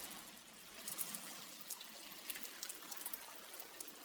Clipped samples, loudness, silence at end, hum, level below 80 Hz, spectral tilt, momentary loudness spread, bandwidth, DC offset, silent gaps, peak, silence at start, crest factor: under 0.1%; -48 LUFS; 0 s; none; -84 dBFS; 0 dB/octave; 8 LU; over 20 kHz; under 0.1%; none; -22 dBFS; 0 s; 28 dB